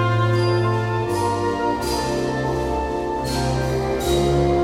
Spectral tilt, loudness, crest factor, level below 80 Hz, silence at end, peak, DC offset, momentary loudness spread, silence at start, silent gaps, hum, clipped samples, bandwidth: -6 dB/octave; -21 LUFS; 12 dB; -34 dBFS; 0 s; -8 dBFS; under 0.1%; 5 LU; 0 s; none; none; under 0.1%; 16 kHz